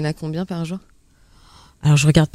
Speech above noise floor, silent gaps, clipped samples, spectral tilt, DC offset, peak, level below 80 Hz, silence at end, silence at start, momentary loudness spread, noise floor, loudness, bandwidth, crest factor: 34 dB; none; under 0.1%; -6 dB/octave; under 0.1%; 0 dBFS; -42 dBFS; 0.1 s; 0 s; 15 LU; -52 dBFS; -19 LUFS; 12 kHz; 20 dB